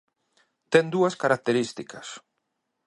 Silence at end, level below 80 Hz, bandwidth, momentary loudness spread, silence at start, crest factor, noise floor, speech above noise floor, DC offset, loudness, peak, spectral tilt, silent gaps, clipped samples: 0.7 s; -74 dBFS; 11.5 kHz; 18 LU; 0.7 s; 22 dB; -79 dBFS; 54 dB; under 0.1%; -24 LUFS; -4 dBFS; -5 dB/octave; none; under 0.1%